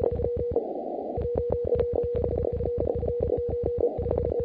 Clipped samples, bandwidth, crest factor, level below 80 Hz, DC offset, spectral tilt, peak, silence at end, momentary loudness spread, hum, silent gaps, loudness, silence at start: under 0.1%; 4.2 kHz; 16 dB; -38 dBFS; under 0.1%; -12 dB/octave; -12 dBFS; 0 s; 4 LU; none; none; -28 LUFS; 0 s